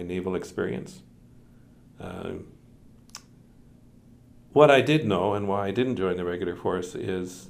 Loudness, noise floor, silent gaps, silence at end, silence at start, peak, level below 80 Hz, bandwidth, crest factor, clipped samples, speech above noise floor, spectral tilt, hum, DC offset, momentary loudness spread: -25 LUFS; -53 dBFS; none; 0 s; 0 s; -2 dBFS; -58 dBFS; 15.5 kHz; 26 dB; under 0.1%; 28 dB; -6 dB/octave; none; under 0.1%; 25 LU